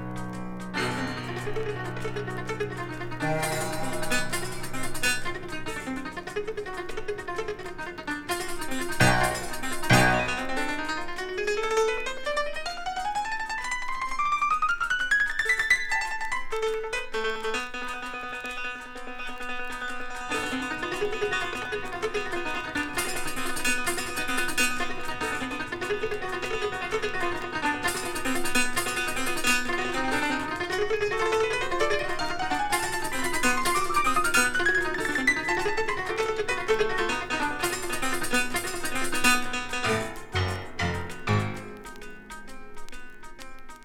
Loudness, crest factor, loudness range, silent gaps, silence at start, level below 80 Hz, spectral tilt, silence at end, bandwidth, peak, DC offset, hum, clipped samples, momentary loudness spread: -28 LUFS; 22 dB; 7 LU; none; 0 s; -42 dBFS; -3.5 dB/octave; 0 s; 17 kHz; -6 dBFS; under 0.1%; none; under 0.1%; 11 LU